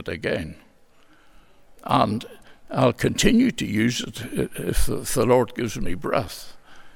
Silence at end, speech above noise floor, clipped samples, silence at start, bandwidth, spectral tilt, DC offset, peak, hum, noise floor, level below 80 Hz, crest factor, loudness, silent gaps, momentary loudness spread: 0.05 s; 31 dB; under 0.1%; 0 s; 17.5 kHz; -5 dB/octave; under 0.1%; -4 dBFS; none; -53 dBFS; -36 dBFS; 18 dB; -23 LUFS; none; 15 LU